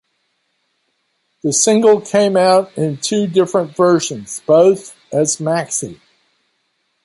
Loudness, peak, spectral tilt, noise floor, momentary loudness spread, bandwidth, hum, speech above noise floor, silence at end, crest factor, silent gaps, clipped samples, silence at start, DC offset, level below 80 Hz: -15 LUFS; 0 dBFS; -4 dB/octave; -67 dBFS; 11 LU; 11.5 kHz; none; 53 dB; 1.1 s; 16 dB; none; under 0.1%; 1.45 s; under 0.1%; -62 dBFS